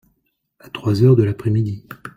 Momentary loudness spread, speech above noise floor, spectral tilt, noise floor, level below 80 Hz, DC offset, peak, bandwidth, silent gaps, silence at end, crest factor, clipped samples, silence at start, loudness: 16 LU; 52 dB; -9 dB/octave; -69 dBFS; -52 dBFS; under 0.1%; -2 dBFS; 15 kHz; none; 0.1 s; 16 dB; under 0.1%; 0.75 s; -17 LUFS